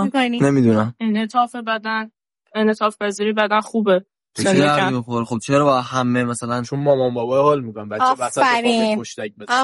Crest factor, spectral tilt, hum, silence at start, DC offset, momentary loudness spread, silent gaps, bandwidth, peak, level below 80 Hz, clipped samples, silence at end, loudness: 16 dB; -5.5 dB/octave; none; 0 s; under 0.1%; 8 LU; none; 11.5 kHz; -2 dBFS; -62 dBFS; under 0.1%; 0 s; -19 LUFS